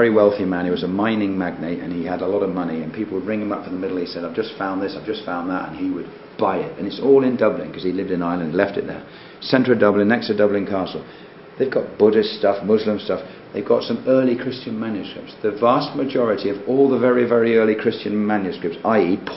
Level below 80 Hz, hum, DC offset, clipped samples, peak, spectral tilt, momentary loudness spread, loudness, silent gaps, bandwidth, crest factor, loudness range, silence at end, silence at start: -56 dBFS; none; 0.1%; under 0.1%; 0 dBFS; -10.5 dB/octave; 11 LU; -20 LUFS; none; 5.8 kHz; 20 dB; 6 LU; 0 s; 0 s